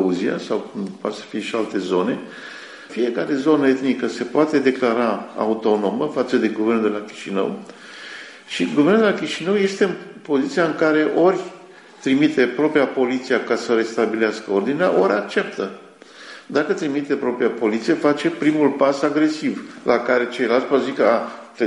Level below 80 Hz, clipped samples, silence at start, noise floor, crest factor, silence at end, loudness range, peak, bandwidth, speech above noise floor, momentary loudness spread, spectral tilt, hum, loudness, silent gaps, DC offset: -68 dBFS; under 0.1%; 0 s; -43 dBFS; 16 dB; 0 s; 3 LU; -4 dBFS; 11 kHz; 24 dB; 12 LU; -5.5 dB/octave; none; -20 LUFS; none; under 0.1%